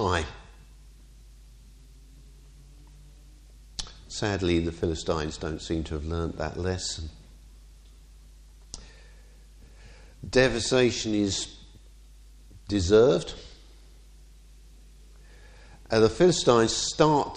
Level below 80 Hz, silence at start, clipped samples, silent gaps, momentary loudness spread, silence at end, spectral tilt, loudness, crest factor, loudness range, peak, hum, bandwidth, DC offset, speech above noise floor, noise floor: -44 dBFS; 0 s; under 0.1%; none; 19 LU; 0 s; -4.5 dB/octave; -25 LUFS; 22 dB; 12 LU; -8 dBFS; none; 11 kHz; under 0.1%; 26 dB; -51 dBFS